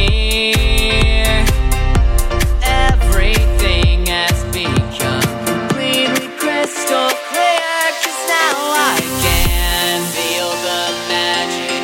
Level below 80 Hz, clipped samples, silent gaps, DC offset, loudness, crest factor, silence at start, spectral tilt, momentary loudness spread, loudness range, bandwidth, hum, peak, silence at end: -18 dBFS; under 0.1%; none; under 0.1%; -15 LUFS; 14 dB; 0 s; -3.5 dB/octave; 4 LU; 1 LU; 17 kHz; none; 0 dBFS; 0 s